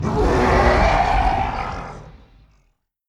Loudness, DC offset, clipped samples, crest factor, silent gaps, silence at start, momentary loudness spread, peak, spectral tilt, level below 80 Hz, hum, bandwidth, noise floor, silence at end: -18 LUFS; under 0.1%; under 0.1%; 16 dB; none; 0 s; 14 LU; -4 dBFS; -6.5 dB/octave; -26 dBFS; none; 11.5 kHz; -64 dBFS; 0.95 s